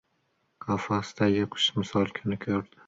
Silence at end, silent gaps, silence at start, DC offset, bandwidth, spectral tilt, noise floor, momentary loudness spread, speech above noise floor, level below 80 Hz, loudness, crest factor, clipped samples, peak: 0.25 s; none; 0.6 s; under 0.1%; 7.8 kHz; -5.5 dB/octave; -73 dBFS; 7 LU; 45 dB; -58 dBFS; -28 LUFS; 18 dB; under 0.1%; -10 dBFS